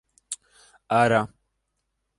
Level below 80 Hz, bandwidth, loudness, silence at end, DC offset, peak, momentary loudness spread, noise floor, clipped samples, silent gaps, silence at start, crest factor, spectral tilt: -62 dBFS; 11.5 kHz; -22 LUFS; 0.9 s; under 0.1%; -6 dBFS; 17 LU; -77 dBFS; under 0.1%; none; 0.3 s; 22 dB; -5 dB/octave